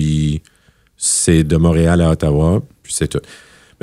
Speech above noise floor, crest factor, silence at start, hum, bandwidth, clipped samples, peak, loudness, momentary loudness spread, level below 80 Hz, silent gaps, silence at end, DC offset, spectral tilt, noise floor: 40 dB; 14 dB; 0 s; none; 13.5 kHz; under 0.1%; 0 dBFS; -15 LUFS; 9 LU; -28 dBFS; none; 0.5 s; under 0.1%; -5.5 dB/octave; -54 dBFS